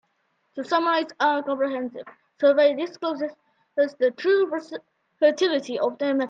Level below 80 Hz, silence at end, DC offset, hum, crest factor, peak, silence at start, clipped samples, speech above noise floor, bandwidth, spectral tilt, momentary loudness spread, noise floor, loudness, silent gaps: -80 dBFS; 0 s; under 0.1%; none; 16 dB; -8 dBFS; 0.55 s; under 0.1%; 48 dB; 7.6 kHz; -3.5 dB/octave; 14 LU; -71 dBFS; -23 LUFS; none